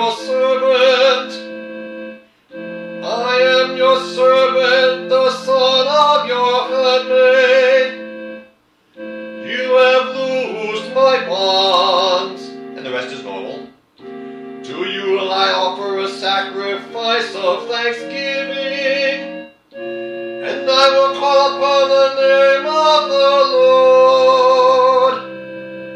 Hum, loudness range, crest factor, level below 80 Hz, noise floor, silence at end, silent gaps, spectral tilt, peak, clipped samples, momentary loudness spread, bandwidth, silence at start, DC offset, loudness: none; 8 LU; 14 dB; -70 dBFS; -53 dBFS; 0 s; none; -3 dB/octave; 0 dBFS; under 0.1%; 19 LU; 9.4 kHz; 0 s; under 0.1%; -14 LUFS